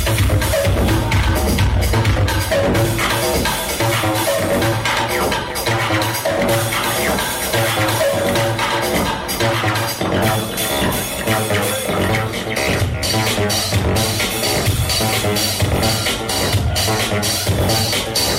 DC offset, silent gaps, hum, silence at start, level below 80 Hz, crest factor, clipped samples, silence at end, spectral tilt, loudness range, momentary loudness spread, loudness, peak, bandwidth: under 0.1%; none; none; 0 s; -28 dBFS; 12 dB; under 0.1%; 0 s; -4 dB/octave; 1 LU; 2 LU; -17 LUFS; -6 dBFS; 16.5 kHz